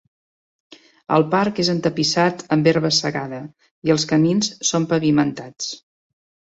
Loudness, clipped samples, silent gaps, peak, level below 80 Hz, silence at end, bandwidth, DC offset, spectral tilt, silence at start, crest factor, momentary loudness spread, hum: -19 LUFS; under 0.1%; 3.71-3.82 s; -2 dBFS; -60 dBFS; 0.8 s; 8 kHz; under 0.1%; -4.5 dB/octave; 1.1 s; 18 dB; 12 LU; none